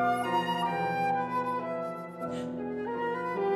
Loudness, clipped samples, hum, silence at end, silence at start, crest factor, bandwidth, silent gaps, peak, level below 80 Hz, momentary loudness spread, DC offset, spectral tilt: -31 LUFS; under 0.1%; none; 0 s; 0 s; 14 dB; 15 kHz; none; -16 dBFS; -68 dBFS; 7 LU; under 0.1%; -6 dB/octave